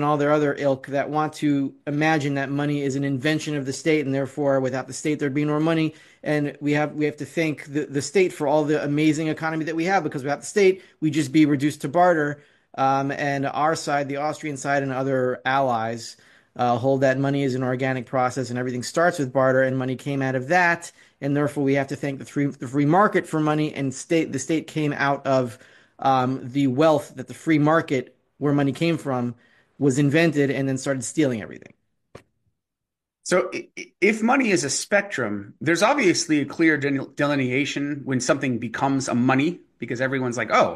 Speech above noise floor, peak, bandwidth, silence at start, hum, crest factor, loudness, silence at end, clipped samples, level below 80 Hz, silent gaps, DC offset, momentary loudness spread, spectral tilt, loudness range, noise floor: 63 dB; -6 dBFS; 12.5 kHz; 0 s; none; 18 dB; -23 LUFS; 0 s; under 0.1%; -66 dBFS; none; under 0.1%; 8 LU; -5.5 dB/octave; 3 LU; -85 dBFS